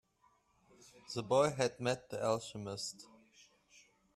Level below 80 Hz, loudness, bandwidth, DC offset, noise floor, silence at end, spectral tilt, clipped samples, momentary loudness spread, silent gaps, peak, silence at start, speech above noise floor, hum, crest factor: -74 dBFS; -36 LUFS; 13.5 kHz; under 0.1%; -73 dBFS; 1.1 s; -4.5 dB/octave; under 0.1%; 12 LU; none; -18 dBFS; 0.85 s; 37 dB; none; 22 dB